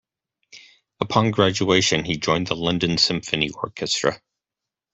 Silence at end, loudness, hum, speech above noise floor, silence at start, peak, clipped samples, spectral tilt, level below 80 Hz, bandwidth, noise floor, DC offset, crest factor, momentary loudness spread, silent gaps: 0.75 s; -21 LUFS; none; 66 dB; 0.55 s; -2 dBFS; under 0.1%; -4 dB/octave; -52 dBFS; 8.4 kHz; -87 dBFS; under 0.1%; 22 dB; 7 LU; none